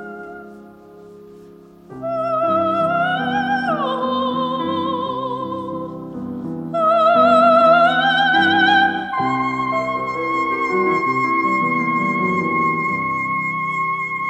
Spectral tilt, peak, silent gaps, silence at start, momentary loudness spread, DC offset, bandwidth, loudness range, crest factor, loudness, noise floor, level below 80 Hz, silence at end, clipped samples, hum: -6 dB/octave; -2 dBFS; none; 0 s; 14 LU; under 0.1%; 9.2 kHz; 8 LU; 16 dB; -17 LUFS; -43 dBFS; -58 dBFS; 0 s; under 0.1%; none